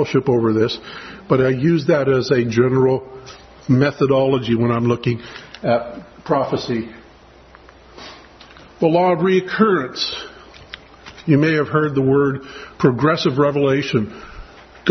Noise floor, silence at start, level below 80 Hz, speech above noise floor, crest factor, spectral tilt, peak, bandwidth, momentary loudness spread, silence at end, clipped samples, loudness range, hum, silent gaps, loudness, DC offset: -45 dBFS; 0 s; -50 dBFS; 28 dB; 18 dB; -7 dB/octave; 0 dBFS; 6.4 kHz; 20 LU; 0 s; under 0.1%; 6 LU; none; none; -18 LUFS; under 0.1%